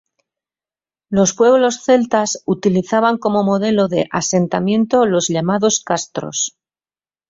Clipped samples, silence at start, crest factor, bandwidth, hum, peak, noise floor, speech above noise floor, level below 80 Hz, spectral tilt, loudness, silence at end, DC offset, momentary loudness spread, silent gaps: under 0.1%; 1.1 s; 16 dB; 7.8 kHz; none; -2 dBFS; under -90 dBFS; over 75 dB; -56 dBFS; -4.5 dB/octave; -16 LUFS; 0.8 s; under 0.1%; 8 LU; none